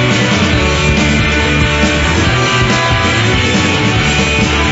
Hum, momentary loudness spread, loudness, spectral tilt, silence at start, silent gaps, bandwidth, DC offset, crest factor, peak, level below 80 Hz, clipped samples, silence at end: none; 1 LU; -11 LUFS; -4.5 dB/octave; 0 s; none; 8 kHz; under 0.1%; 12 dB; 0 dBFS; -22 dBFS; under 0.1%; 0 s